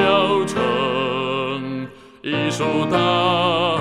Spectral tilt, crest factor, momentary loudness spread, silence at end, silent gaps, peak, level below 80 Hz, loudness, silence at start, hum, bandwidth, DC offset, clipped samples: -5 dB/octave; 16 dB; 11 LU; 0 s; none; -4 dBFS; -58 dBFS; -19 LUFS; 0 s; none; 13.5 kHz; 0.2%; under 0.1%